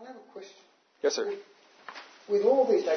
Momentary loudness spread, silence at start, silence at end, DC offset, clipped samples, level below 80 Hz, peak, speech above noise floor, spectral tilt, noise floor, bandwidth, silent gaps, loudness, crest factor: 24 LU; 0 s; 0 s; under 0.1%; under 0.1%; under -90 dBFS; -12 dBFS; 36 dB; -3.5 dB/octave; -61 dBFS; 6.6 kHz; none; -27 LUFS; 18 dB